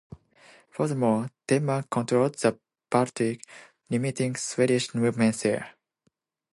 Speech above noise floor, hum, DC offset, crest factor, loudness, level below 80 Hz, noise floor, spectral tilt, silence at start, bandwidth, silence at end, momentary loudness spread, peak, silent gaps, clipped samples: 48 dB; none; under 0.1%; 20 dB; -26 LUFS; -68 dBFS; -73 dBFS; -5.5 dB/octave; 0.1 s; 11.5 kHz; 0.85 s; 7 LU; -6 dBFS; none; under 0.1%